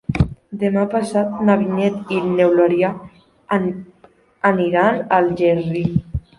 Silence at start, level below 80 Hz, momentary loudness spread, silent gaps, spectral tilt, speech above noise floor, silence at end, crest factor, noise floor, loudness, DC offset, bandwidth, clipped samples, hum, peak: 0.1 s; -38 dBFS; 7 LU; none; -8 dB/octave; 27 dB; 0.2 s; 16 dB; -44 dBFS; -18 LUFS; under 0.1%; 11.5 kHz; under 0.1%; none; -2 dBFS